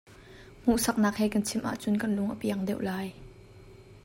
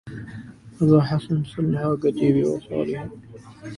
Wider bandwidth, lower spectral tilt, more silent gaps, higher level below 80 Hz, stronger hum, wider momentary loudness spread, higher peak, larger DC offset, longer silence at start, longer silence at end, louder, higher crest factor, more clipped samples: first, 16.5 kHz vs 11 kHz; second, -5 dB/octave vs -9 dB/octave; neither; about the same, -54 dBFS vs -52 dBFS; neither; second, 7 LU vs 20 LU; second, -14 dBFS vs -4 dBFS; neither; about the same, 0.1 s vs 0.05 s; about the same, 0.05 s vs 0 s; second, -29 LUFS vs -22 LUFS; about the same, 16 dB vs 18 dB; neither